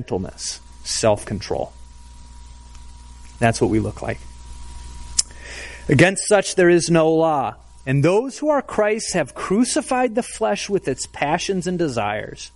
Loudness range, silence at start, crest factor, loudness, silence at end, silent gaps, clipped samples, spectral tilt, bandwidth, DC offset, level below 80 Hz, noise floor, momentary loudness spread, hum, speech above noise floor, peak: 8 LU; 0 s; 20 dB; -20 LUFS; 0.05 s; none; under 0.1%; -4.5 dB/octave; 11.5 kHz; under 0.1%; -42 dBFS; -40 dBFS; 17 LU; 60 Hz at -45 dBFS; 21 dB; 0 dBFS